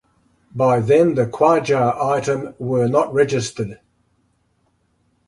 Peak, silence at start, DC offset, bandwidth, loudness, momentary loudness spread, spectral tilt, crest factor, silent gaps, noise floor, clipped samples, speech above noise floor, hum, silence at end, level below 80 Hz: -2 dBFS; 0.55 s; under 0.1%; 11.5 kHz; -18 LUFS; 11 LU; -6.5 dB/octave; 16 dB; none; -64 dBFS; under 0.1%; 47 dB; none; 1.55 s; -56 dBFS